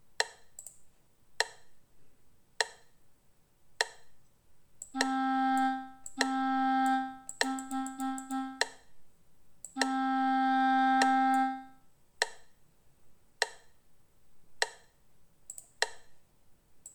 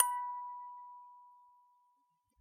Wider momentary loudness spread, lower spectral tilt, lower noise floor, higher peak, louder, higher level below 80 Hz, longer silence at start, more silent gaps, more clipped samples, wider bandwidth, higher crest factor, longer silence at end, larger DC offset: second, 19 LU vs 23 LU; first, -1 dB/octave vs 3.5 dB/octave; second, -64 dBFS vs -77 dBFS; about the same, -8 dBFS vs -8 dBFS; first, -32 LUFS vs -40 LUFS; first, -72 dBFS vs under -90 dBFS; about the same, 0.1 s vs 0 s; neither; neither; first, 19 kHz vs 13.5 kHz; second, 26 dB vs 34 dB; second, 0.05 s vs 1 s; neither